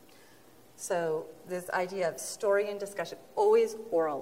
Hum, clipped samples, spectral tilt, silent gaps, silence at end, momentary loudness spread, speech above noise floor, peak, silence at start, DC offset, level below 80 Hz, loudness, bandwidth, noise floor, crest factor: none; under 0.1%; -3.5 dB/octave; none; 0 s; 13 LU; 28 dB; -16 dBFS; 0.8 s; under 0.1%; -78 dBFS; -31 LUFS; 16 kHz; -58 dBFS; 16 dB